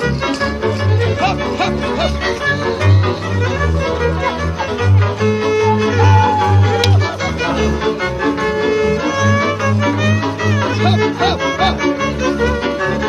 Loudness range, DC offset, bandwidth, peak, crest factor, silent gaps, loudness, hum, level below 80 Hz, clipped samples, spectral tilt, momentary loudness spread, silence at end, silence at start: 2 LU; under 0.1%; 9.6 kHz; 0 dBFS; 14 dB; none; -15 LUFS; none; -30 dBFS; under 0.1%; -6 dB/octave; 5 LU; 0 s; 0 s